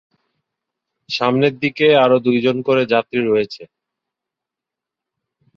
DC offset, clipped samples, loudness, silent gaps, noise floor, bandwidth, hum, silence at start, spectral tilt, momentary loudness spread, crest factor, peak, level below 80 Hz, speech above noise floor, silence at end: under 0.1%; under 0.1%; -16 LUFS; none; -85 dBFS; 7.2 kHz; none; 1.1 s; -6.5 dB/octave; 9 LU; 18 dB; -2 dBFS; -62 dBFS; 69 dB; 1.9 s